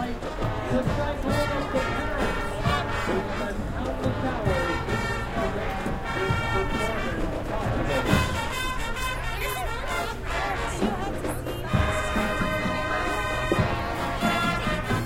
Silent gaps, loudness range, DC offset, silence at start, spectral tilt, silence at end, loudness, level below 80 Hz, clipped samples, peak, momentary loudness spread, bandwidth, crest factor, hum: none; 2 LU; 0.1%; 0 s; -5.5 dB/octave; 0 s; -27 LUFS; -34 dBFS; under 0.1%; -8 dBFS; 5 LU; 16 kHz; 18 dB; none